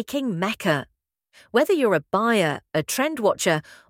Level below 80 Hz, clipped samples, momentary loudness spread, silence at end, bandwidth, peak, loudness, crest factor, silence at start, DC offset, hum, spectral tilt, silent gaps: -64 dBFS; under 0.1%; 6 LU; 0.15 s; 17 kHz; -4 dBFS; -22 LUFS; 20 dB; 0 s; under 0.1%; none; -4.5 dB/octave; none